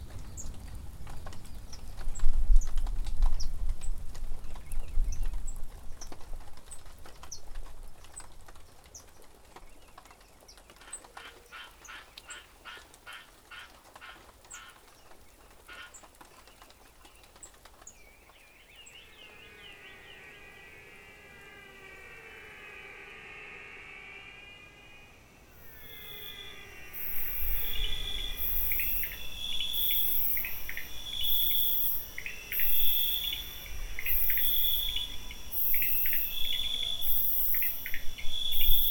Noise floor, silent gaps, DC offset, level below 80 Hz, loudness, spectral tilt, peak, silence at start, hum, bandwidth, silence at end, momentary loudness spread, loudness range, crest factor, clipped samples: -57 dBFS; none; under 0.1%; -36 dBFS; -29 LUFS; -1.5 dB/octave; -8 dBFS; 0 s; none; over 20 kHz; 0 s; 26 LU; 24 LU; 22 dB; under 0.1%